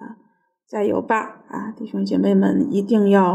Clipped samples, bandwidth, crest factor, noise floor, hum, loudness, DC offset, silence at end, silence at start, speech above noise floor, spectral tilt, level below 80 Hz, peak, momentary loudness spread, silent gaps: under 0.1%; 8.4 kHz; 16 dB; -61 dBFS; none; -19 LUFS; under 0.1%; 0 s; 0 s; 43 dB; -8 dB/octave; -68 dBFS; -4 dBFS; 15 LU; none